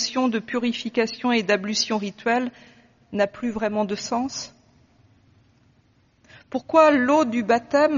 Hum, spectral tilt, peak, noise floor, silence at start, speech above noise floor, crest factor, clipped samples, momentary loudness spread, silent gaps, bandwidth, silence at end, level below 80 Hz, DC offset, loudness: none; -2.5 dB/octave; -4 dBFS; -61 dBFS; 0 s; 39 dB; 20 dB; under 0.1%; 14 LU; none; 7.2 kHz; 0 s; -62 dBFS; under 0.1%; -22 LUFS